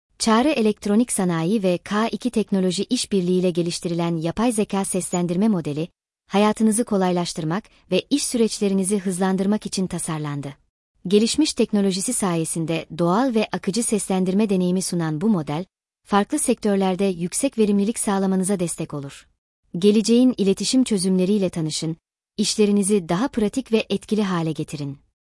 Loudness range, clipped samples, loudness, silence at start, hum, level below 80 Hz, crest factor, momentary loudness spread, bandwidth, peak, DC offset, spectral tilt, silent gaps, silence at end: 2 LU; under 0.1%; -21 LUFS; 0.2 s; none; -56 dBFS; 16 dB; 9 LU; 12 kHz; -6 dBFS; under 0.1%; -5 dB/octave; 10.69-10.94 s, 19.38-19.63 s; 0.4 s